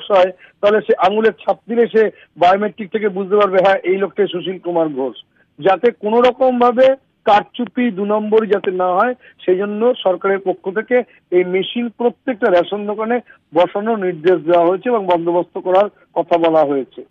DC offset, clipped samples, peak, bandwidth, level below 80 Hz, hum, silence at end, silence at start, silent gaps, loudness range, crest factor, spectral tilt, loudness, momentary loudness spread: under 0.1%; under 0.1%; -4 dBFS; 7 kHz; -60 dBFS; none; 0.1 s; 0 s; none; 3 LU; 12 dB; -7 dB/octave; -16 LUFS; 7 LU